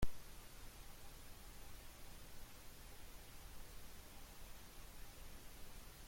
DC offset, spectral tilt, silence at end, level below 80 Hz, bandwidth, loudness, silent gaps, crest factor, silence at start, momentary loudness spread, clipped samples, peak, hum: under 0.1%; -3.5 dB/octave; 0 s; -56 dBFS; 16.5 kHz; -58 LUFS; none; 22 dB; 0 s; 1 LU; under 0.1%; -26 dBFS; none